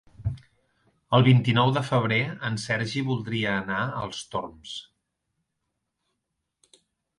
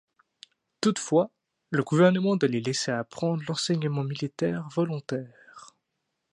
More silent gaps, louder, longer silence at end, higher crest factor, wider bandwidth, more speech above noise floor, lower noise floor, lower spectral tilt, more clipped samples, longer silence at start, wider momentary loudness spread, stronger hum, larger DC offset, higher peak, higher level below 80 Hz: neither; about the same, -25 LUFS vs -27 LUFS; first, 2.35 s vs 0.65 s; about the same, 20 dB vs 20 dB; about the same, 11 kHz vs 11.5 kHz; about the same, 57 dB vs 55 dB; about the same, -81 dBFS vs -81 dBFS; about the same, -6 dB/octave vs -5.5 dB/octave; neither; second, 0.2 s vs 0.8 s; first, 17 LU vs 11 LU; neither; neither; about the same, -8 dBFS vs -8 dBFS; first, -54 dBFS vs -72 dBFS